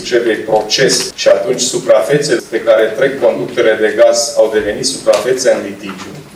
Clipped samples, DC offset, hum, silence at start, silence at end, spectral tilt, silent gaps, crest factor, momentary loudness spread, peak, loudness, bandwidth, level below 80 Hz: under 0.1%; under 0.1%; none; 0 s; 0 s; -3 dB/octave; none; 12 dB; 5 LU; 0 dBFS; -12 LUFS; 15 kHz; -50 dBFS